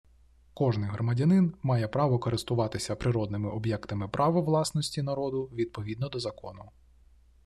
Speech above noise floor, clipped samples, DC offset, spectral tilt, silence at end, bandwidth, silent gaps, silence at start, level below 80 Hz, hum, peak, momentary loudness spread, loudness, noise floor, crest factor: 31 dB; under 0.1%; under 0.1%; -6.5 dB/octave; 0.75 s; 13 kHz; none; 0.55 s; -56 dBFS; none; -14 dBFS; 9 LU; -29 LUFS; -59 dBFS; 16 dB